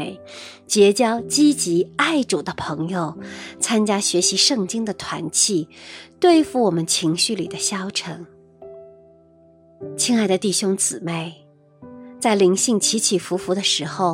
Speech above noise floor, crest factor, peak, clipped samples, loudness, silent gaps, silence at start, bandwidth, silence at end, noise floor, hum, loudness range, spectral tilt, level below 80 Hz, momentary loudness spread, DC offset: 32 dB; 20 dB; -2 dBFS; under 0.1%; -19 LUFS; none; 0 s; 16 kHz; 0 s; -52 dBFS; none; 5 LU; -3 dB/octave; -62 dBFS; 18 LU; under 0.1%